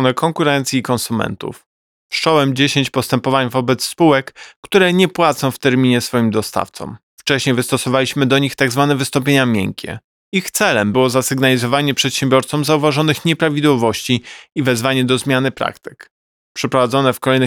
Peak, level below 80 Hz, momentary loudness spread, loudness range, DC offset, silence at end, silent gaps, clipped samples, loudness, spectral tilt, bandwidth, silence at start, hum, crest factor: 0 dBFS; -56 dBFS; 9 LU; 2 LU; 0.1%; 0 s; 1.66-2.09 s, 4.56-4.63 s, 7.03-7.17 s, 10.04-10.32 s, 16.11-16.55 s; under 0.1%; -16 LUFS; -4.5 dB/octave; 19.5 kHz; 0 s; none; 14 dB